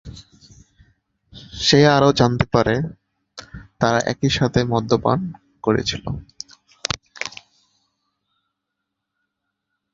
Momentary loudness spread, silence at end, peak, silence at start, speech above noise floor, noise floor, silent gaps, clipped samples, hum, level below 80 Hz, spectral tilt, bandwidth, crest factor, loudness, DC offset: 23 LU; 2.65 s; 0 dBFS; 0.05 s; 62 dB; -80 dBFS; none; under 0.1%; none; -44 dBFS; -5 dB/octave; 7.8 kHz; 22 dB; -19 LUFS; under 0.1%